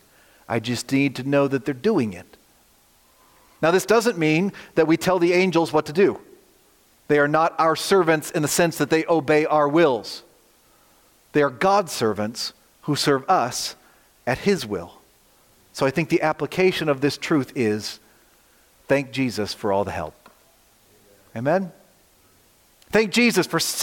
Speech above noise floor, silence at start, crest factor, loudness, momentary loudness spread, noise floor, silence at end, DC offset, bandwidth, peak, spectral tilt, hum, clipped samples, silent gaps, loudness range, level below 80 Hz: 37 dB; 0.5 s; 16 dB; -21 LUFS; 12 LU; -58 dBFS; 0 s; under 0.1%; 17 kHz; -6 dBFS; -4.5 dB/octave; none; under 0.1%; none; 7 LU; -60 dBFS